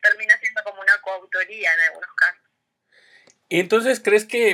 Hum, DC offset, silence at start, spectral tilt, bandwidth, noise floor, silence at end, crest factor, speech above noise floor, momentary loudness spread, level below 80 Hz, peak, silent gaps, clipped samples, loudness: none; under 0.1%; 0.05 s; -3 dB/octave; 16.5 kHz; -72 dBFS; 0 s; 18 dB; 53 dB; 8 LU; under -90 dBFS; -4 dBFS; none; under 0.1%; -19 LUFS